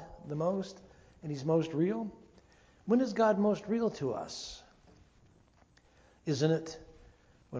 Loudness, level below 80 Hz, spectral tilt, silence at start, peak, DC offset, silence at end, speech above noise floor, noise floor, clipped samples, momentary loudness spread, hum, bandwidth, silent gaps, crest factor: -33 LUFS; -64 dBFS; -6.5 dB/octave; 0 s; -16 dBFS; under 0.1%; 0 s; 33 dB; -65 dBFS; under 0.1%; 18 LU; none; 8 kHz; none; 18 dB